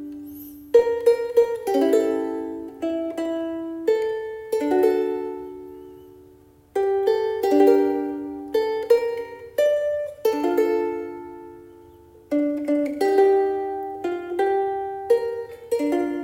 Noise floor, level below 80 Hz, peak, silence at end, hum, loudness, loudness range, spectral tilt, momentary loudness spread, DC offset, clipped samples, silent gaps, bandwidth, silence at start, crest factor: -52 dBFS; -62 dBFS; -4 dBFS; 0 s; none; -23 LUFS; 4 LU; -5 dB/octave; 14 LU; under 0.1%; under 0.1%; none; 16.5 kHz; 0 s; 18 dB